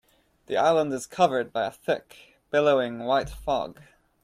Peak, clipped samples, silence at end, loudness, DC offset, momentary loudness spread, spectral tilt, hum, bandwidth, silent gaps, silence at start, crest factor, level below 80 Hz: -8 dBFS; under 0.1%; 0.5 s; -25 LUFS; under 0.1%; 8 LU; -5 dB/octave; none; 15 kHz; none; 0.5 s; 18 dB; -52 dBFS